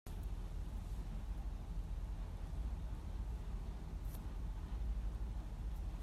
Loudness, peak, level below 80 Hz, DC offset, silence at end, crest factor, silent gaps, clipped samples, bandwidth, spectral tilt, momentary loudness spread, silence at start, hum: -47 LUFS; -24 dBFS; -44 dBFS; under 0.1%; 0 s; 18 dB; none; under 0.1%; 13.5 kHz; -7 dB/octave; 3 LU; 0.05 s; none